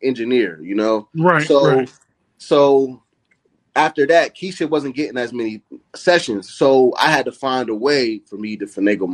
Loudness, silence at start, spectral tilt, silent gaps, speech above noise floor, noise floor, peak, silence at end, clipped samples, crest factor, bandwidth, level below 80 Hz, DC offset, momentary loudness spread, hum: -17 LUFS; 0 s; -5 dB/octave; none; 46 dB; -63 dBFS; 0 dBFS; 0 s; under 0.1%; 18 dB; 12 kHz; -64 dBFS; under 0.1%; 12 LU; none